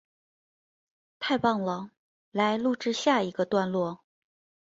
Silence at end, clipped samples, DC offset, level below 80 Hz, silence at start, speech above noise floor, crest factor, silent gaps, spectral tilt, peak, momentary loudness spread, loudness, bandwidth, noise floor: 0.7 s; under 0.1%; under 0.1%; -70 dBFS; 1.2 s; over 63 dB; 20 dB; 1.97-2.32 s; -5 dB/octave; -10 dBFS; 11 LU; -28 LUFS; 7.8 kHz; under -90 dBFS